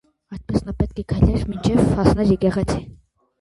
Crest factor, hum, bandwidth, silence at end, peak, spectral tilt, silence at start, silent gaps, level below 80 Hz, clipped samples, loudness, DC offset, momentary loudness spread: 18 dB; none; 11.5 kHz; 0.45 s; -2 dBFS; -8 dB/octave; 0.3 s; none; -30 dBFS; under 0.1%; -20 LUFS; under 0.1%; 9 LU